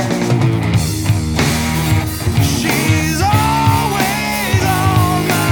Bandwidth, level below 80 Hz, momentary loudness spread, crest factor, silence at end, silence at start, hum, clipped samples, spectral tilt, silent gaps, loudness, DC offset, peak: over 20 kHz; -28 dBFS; 3 LU; 12 dB; 0 s; 0 s; none; under 0.1%; -5 dB/octave; none; -15 LUFS; under 0.1%; -2 dBFS